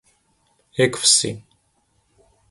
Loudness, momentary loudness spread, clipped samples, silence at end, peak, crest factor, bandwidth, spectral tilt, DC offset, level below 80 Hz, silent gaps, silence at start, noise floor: -17 LUFS; 18 LU; under 0.1%; 1.1 s; -2 dBFS; 22 dB; 11.5 kHz; -2 dB/octave; under 0.1%; -60 dBFS; none; 0.75 s; -65 dBFS